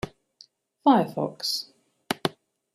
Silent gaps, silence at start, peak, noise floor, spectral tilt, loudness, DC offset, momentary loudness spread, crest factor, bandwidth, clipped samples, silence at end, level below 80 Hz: none; 0.05 s; -6 dBFS; -57 dBFS; -4.5 dB/octave; -26 LUFS; under 0.1%; 14 LU; 22 dB; 15 kHz; under 0.1%; 0.45 s; -62 dBFS